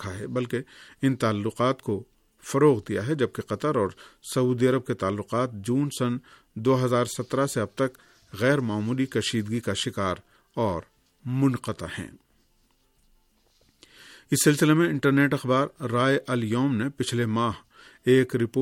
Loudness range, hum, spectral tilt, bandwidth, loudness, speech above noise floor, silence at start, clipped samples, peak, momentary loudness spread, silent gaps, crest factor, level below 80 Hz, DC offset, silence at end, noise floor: 7 LU; none; -5.5 dB/octave; 16.5 kHz; -26 LUFS; 41 dB; 0 s; under 0.1%; -8 dBFS; 12 LU; none; 18 dB; -60 dBFS; under 0.1%; 0 s; -66 dBFS